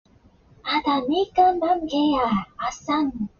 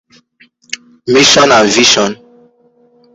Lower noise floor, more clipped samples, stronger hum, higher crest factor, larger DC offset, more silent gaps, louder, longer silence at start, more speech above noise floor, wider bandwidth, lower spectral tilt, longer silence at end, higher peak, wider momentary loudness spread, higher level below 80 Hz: first, -55 dBFS vs -50 dBFS; neither; neither; about the same, 16 dB vs 12 dB; neither; neither; second, -22 LUFS vs -7 LUFS; second, 0.65 s vs 1.05 s; second, 33 dB vs 42 dB; second, 7.2 kHz vs 16 kHz; about the same, -3 dB/octave vs -2 dB/octave; second, 0.15 s vs 1 s; second, -6 dBFS vs 0 dBFS; second, 8 LU vs 20 LU; about the same, -52 dBFS vs -50 dBFS